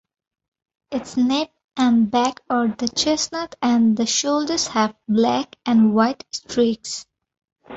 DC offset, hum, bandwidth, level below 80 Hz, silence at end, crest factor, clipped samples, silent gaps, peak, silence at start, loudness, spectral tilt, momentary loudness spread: under 0.1%; none; 8 kHz; -58 dBFS; 0 s; 16 dB; under 0.1%; 1.64-1.68 s, 7.52-7.56 s; -4 dBFS; 0.9 s; -20 LUFS; -3.5 dB/octave; 10 LU